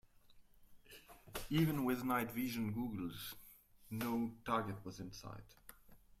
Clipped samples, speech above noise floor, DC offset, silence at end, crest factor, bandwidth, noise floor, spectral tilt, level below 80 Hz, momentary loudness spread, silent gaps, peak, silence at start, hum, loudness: under 0.1%; 24 dB; under 0.1%; 0.2 s; 20 dB; 16 kHz; -64 dBFS; -6 dB/octave; -64 dBFS; 23 LU; none; -24 dBFS; 0.3 s; none; -41 LUFS